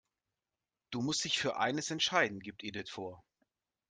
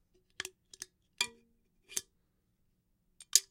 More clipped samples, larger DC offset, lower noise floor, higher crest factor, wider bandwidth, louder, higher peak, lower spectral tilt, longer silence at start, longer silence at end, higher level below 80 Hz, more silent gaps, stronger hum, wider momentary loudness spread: neither; neither; first, under -90 dBFS vs -76 dBFS; second, 24 dB vs 38 dB; second, 10.5 kHz vs 16.5 kHz; about the same, -34 LUFS vs -35 LUFS; second, -14 dBFS vs -4 dBFS; first, -2.5 dB/octave vs 2.5 dB/octave; first, 0.9 s vs 0.4 s; first, 0.7 s vs 0.1 s; about the same, -74 dBFS vs -76 dBFS; neither; neither; second, 14 LU vs 21 LU